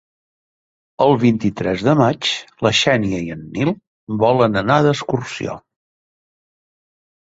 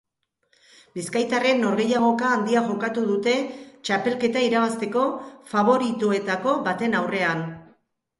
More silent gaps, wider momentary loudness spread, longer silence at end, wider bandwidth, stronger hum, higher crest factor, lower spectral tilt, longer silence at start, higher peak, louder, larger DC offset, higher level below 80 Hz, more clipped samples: first, 3.87-4.07 s vs none; first, 12 LU vs 8 LU; first, 1.7 s vs 0.55 s; second, 8 kHz vs 11.5 kHz; neither; about the same, 18 dB vs 18 dB; about the same, -5.5 dB/octave vs -5 dB/octave; about the same, 1 s vs 0.95 s; first, -2 dBFS vs -6 dBFS; first, -17 LUFS vs -23 LUFS; neither; first, -50 dBFS vs -68 dBFS; neither